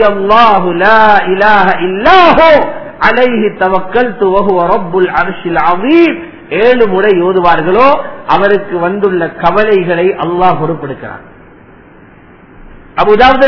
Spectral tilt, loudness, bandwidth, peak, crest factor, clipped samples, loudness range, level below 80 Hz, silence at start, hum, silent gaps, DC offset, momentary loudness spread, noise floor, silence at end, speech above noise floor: -7 dB/octave; -9 LUFS; 5.4 kHz; 0 dBFS; 10 dB; 3%; 6 LU; -36 dBFS; 0 s; none; none; 6%; 8 LU; -37 dBFS; 0 s; 29 dB